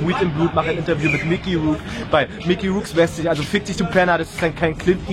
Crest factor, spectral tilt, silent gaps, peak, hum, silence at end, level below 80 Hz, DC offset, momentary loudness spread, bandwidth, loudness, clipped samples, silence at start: 16 dB; -6 dB/octave; none; -2 dBFS; none; 0 s; -38 dBFS; under 0.1%; 3 LU; 14 kHz; -20 LUFS; under 0.1%; 0 s